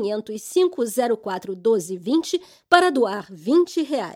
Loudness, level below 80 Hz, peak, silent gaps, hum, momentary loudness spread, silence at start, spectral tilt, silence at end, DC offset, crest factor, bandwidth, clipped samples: -22 LUFS; -70 dBFS; 0 dBFS; none; none; 11 LU; 0 s; -4 dB/octave; 0 s; under 0.1%; 22 dB; 16 kHz; under 0.1%